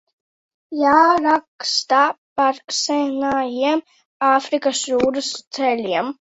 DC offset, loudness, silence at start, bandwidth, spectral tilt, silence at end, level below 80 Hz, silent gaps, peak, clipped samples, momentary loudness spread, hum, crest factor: under 0.1%; -19 LUFS; 0.7 s; 8.4 kHz; -2 dB/octave; 0.15 s; -60 dBFS; 1.48-1.59 s, 2.18-2.36 s, 4.05-4.20 s, 5.47-5.51 s; -2 dBFS; under 0.1%; 8 LU; none; 18 dB